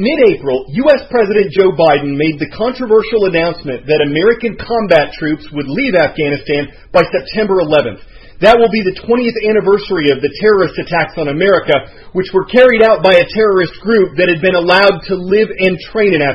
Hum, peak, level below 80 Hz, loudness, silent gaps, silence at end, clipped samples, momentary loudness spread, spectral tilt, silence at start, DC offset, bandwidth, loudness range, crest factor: none; 0 dBFS; -40 dBFS; -12 LUFS; none; 0 s; 0.2%; 9 LU; -7 dB/octave; 0 s; under 0.1%; 7.4 kHz; 4 LU; 12 dB